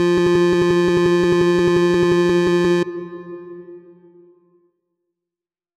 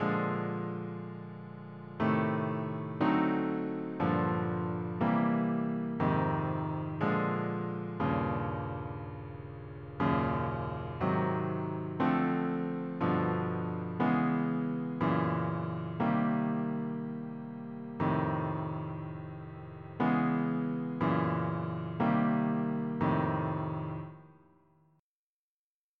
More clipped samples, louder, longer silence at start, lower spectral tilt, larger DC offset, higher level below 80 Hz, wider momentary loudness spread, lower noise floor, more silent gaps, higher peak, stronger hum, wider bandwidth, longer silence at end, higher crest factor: neither; first, -16 LUFS vs -33 LUFS; about the same, 0 s vs 0 s; second, -6.5 dB/octave vs -10.5 dB/octave; neither; first, -48 dBFS vs -62 dBFS; first, 19 LU vs 13 LU; about the same, -89 dBFS vs under -90 dBFS; neither; first, -8 dBFS vs -16 dBFS; neither; first, 10.5 kHz vs 5.4 kHz; first, 1.95 s vs 1.7 s; second, 10 dB vs 16 dB